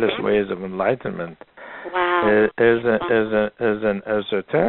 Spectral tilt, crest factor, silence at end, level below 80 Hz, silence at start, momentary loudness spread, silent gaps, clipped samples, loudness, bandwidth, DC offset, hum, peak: -4 dB/octave; 18 dB; 0 s; -52 dBFS; 0 s; 14 LU; none; under 0.1%; -20 LUFS; 4.2 kHz; under 0.1%; none; -4 dBFS